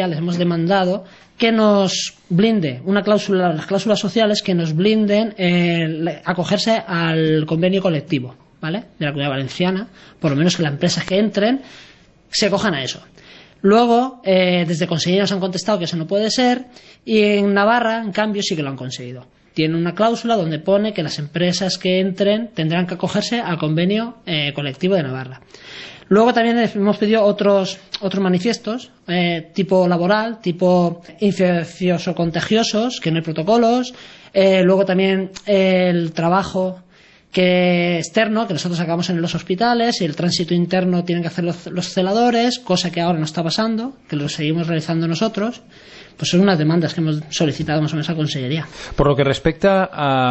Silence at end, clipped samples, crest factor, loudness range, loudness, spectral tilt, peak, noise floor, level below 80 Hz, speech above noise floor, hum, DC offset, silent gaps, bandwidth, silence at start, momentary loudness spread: 0 s; under 0.1%; 16 dB; 3 LU; -18 LUFS; -5.5 dB/octave; -2 dBFS; -50 dBFS; -48 dBFS; 32 dB; none; under 0.1%; none; 8.4 kHz; 0 s; 9 LU